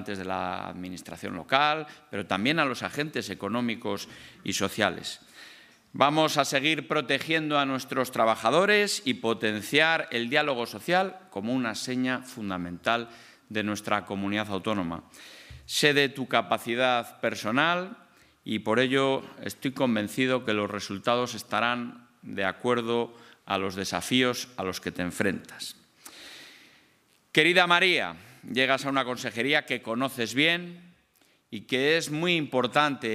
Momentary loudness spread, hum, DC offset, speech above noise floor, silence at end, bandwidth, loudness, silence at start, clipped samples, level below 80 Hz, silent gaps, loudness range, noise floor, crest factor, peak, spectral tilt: 16 LU; none; under 0.1%; 38 dB; 0 s; 15.5 kHz; -27 LUFS; 0 s; under 0.1%; -70 dBFS; none; 6 LU; -65 dBFS; 24 dB; -4 dBFS; -4 dB/octave